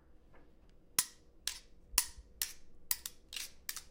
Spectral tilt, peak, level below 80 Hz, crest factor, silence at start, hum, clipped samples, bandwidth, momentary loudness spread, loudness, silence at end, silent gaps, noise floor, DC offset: 1 dB/octave; -12 dBFS; -58 dBFS; 32 dB; 0.1 s; none; under 0.1%; 17 kHz; 11 LU; -38 LUFS; 0 s; none; -61 dBFS; under 0.1%